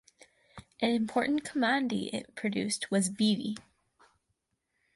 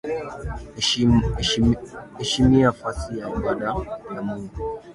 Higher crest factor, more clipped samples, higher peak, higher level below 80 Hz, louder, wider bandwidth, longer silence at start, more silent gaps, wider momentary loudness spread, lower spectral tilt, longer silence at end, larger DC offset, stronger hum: about the same, 18 dB vs 18 dB; neither; second, -14 dBFS vs -4 dBFS; second, -70 dBFS vs -34 dBFS; second, -30 LUFS vs -22 LUFS; about the same, 11.5 kHz vs 11.5 kHz; first, 0.55 s vs 0.05 s; neither; second, 7 LU vs 15 LU; second, -4 dB/octave vs -5.5 dB/octave; first, 1.35 s vs 0 s; neither; neither